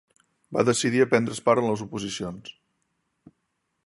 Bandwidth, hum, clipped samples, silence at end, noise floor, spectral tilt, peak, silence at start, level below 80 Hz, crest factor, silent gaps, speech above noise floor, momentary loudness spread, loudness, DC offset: 11.5 kHz; none; under 0.1%; 1.35 s; -77 dBFS; -4.5 dB/octave; -4 dBFS; 0.5 s; -62 dBFS; 22 dB; none; 53 dB; 14 LU; -24 LUFS; under 0.1%